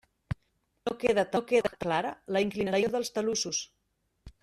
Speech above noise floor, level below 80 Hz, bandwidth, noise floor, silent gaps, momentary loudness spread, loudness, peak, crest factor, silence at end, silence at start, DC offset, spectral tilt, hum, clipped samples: 48 dB; -58 dBFS; 13.5 kHz; -77 dBFS; none; 14 LU; -29 LUFS; -12 dBFS; 18 dB; 0.1 s; 0.3 s; under 0.1%; -4 dB/octave; none; under 0.1%